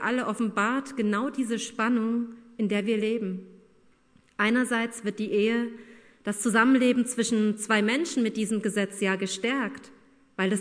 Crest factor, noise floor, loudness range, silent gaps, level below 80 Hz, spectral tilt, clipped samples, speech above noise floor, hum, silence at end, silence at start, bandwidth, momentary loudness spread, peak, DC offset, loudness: 18 dB; -61 dBFS; 4 LU; none; -74 dBFS; -4.5 dB/octave; under 0.1%; 35 dB; none; 0 s; 0 s; 11 kHz; 11 LU; -8 dBFS; under 0.1%; -26 LUFS